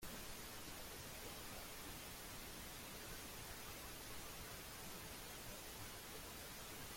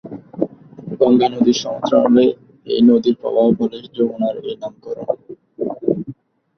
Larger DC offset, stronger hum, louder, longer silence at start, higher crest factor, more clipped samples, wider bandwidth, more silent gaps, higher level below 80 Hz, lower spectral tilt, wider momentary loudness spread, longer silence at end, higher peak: neither; neither; second, -51 LUFS vs -17 LUFS; about the same, 0 s vs 0.05 s; about the same, 14 dB vs 16 dB; neither; first, 16.5 kHz vs 6.4 kHz; neither; about the same, -62 dBFS vs -58 dBFS; second, -2.5 dB/octave vs -6.5 dB/octave; second, 1 LU vs 16 LU; second, 0 s vs 0.45 s; second, -38 dBFS vs -2 dBFS